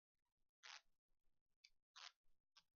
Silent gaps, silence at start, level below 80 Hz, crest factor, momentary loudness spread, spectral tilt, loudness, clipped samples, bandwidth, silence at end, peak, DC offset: 0.49-0.63 s, 0.98-1.09 s, 1.41-1.46 s, 1.56-1.64 s, 1.82-1.94 s, 2.16-2.24 s, 2.40-2.44 s; 0.45 s; under -90 dBFS; 30 dB; 5 LU; 5 dB/octave; -63 LUFS; under 0.1%; 7 kHz; 0.1 s; -40 dBFS; under 0.1%